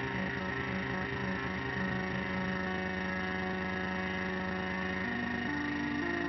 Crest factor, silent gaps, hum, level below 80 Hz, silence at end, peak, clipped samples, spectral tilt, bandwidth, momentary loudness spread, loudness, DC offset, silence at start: 12 dB; none; none; -52 dBFS; 0 s; -22 dBFS; under 0.1%; -4 dB/octave; 6 kHz; 1 LU; -34 LUFS; under 0.1%; 0 s